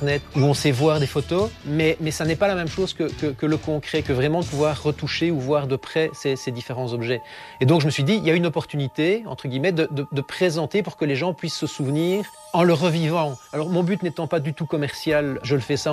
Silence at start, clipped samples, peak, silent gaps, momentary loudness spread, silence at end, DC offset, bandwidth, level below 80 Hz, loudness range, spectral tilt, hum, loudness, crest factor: 0 s; under 0.1%; -6 dBFS; none; 7 LU; 0 s; under 0.1%; 13.5 kHz; -52 dBFS; 2 LU; -6 dB/octave; none; -23 LUFS; 16 dB